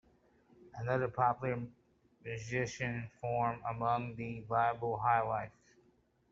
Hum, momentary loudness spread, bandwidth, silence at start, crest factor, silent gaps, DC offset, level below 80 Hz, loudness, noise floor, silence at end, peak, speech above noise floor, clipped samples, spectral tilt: none; 13 LU; 7.6 kHz; 0.6 s; 20 dB; none; under 0.1%; -66 dBFS; -36 LUFS; -71 dBFS; 0.8 s; -16 dBFS; 36 dB; under 0.1%; -5.5 dB/octave